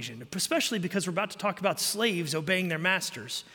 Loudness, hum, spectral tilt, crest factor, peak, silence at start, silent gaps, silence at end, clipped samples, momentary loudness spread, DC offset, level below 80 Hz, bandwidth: -28 LUFS; none; -3 dB/octave; 20 dB; -10 dBFS; 0 s; none; 0 s; under 0.1%; 5 LU; under 0.1%; -74 dBFS; 17 kHz